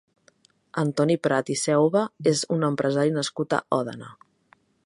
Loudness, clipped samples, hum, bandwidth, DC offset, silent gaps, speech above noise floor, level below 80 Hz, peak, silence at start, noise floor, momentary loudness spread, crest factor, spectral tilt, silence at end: -24 LUFS; under 0.1%; none; 11.5 kHz; under 0.1%; none; 38 dB; -70 dBFS; -6 dBFS; 0.75 s; -62 dBFS; 6 LU; 20 dB; -5 dB/octave; 0.75 s